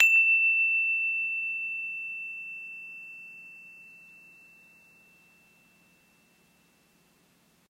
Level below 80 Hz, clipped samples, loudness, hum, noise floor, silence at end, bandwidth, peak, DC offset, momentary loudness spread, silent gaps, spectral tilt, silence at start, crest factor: -84 dBFS; under 0.1%; -25 LUFS; none; -65 dBFS; 3.75 s; 15.5 kHz; -4 dBFS; under 0.1%; 26 LU; none; 0 dB/octave; 0 s; 28 dB